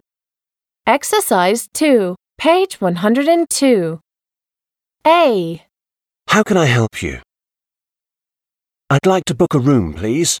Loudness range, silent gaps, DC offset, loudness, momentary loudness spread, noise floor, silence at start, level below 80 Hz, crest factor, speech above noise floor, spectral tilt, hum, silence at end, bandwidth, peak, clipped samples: 4 LU; none; under 0.1%; -15 LUFS; 11 LU; -90 dBFS; 0.85 s; -46 dBFS; 16 dB; 76 dB; -5 dB/octave; none; 0 s; 19 kHz; 0 dBFS; under 0.1%